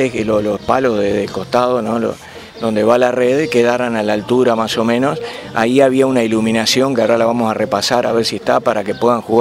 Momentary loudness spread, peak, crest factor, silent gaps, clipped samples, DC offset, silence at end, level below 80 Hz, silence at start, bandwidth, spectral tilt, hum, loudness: 6 LU; 0 dBFS; 14 dB; none; under 0.1%; under 0.1%; 0 s; -50 dBFS; 0 s; 16 kHz; -5 dB/octave; none; -15 LUFS